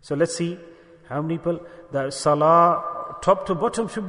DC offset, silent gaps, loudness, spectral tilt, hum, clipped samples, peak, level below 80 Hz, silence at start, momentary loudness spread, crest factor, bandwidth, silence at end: under 0.1%; none; -22 LUFS; -5.5 dB/octave; none; under 0.1%; -4 dBFS; -56 dBFS; 0.05 s; 15 LU; 18 dB; 11 kHz; 0 s